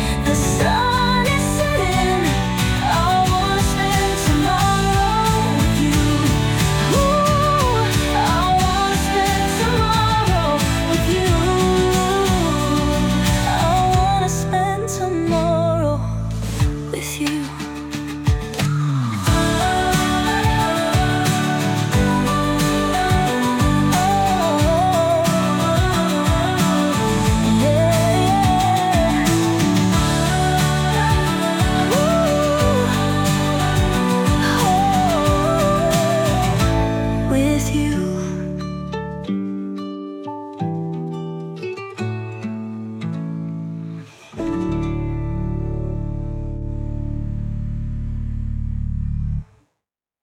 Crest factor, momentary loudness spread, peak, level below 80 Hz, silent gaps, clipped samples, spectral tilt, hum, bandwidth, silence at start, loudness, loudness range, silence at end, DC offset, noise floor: 14 dB; 11 LU; -4 dBFS; -28 dBFS; none; under 0.1%; -5 dB/octave; none; 19 kHz; 0 s; -18 LUFS; 10 LU; 0.8 s; under 0.1%; -80 dBFS